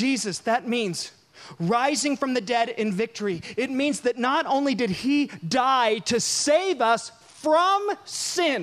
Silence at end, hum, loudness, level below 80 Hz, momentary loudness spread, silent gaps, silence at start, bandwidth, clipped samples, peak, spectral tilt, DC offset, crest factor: 0 s; none; -24 LUFS; -66 dBFS; 8 LU; none; 0 s; 15 kHz; under 0.1%; -8 dBFS; -3.5 dB/octave; under 0.1%; 16 dB